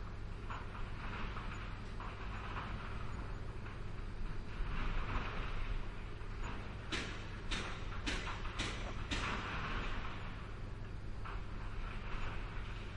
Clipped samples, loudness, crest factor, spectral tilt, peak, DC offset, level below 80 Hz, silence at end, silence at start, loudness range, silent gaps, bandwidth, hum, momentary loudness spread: under 0.1%; -44 LUFS; 16 dB; -5 dB/octave; -24 dBFS; under 0.1%; -44 dBFS; 0 s; 0 s; 4 LU; none; 10.5 kHz; none; 7 LU